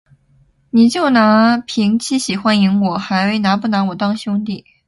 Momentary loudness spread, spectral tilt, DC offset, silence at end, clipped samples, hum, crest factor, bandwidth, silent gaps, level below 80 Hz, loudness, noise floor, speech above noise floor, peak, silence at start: 9 LU; -5.5 dB/octave; under 0.1%; 0.25 s; under 0.1%; none; 14 dB; 11.5 kHz; none; -56 dBFS; -15 LUFS; -54 dBFS; 40 dB; 0 dBFS; 0.75 s